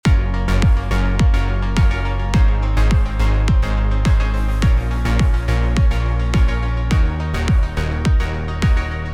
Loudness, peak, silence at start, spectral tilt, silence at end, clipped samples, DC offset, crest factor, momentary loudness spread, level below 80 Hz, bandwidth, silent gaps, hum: -18 LUFS; -4 dBFS; 0.05 s; -6.5 dB/octave; 0 s; under 0.1%; 0.9%; 12 dB; 3 LU; -16 dBFS; 10 kHz; none; none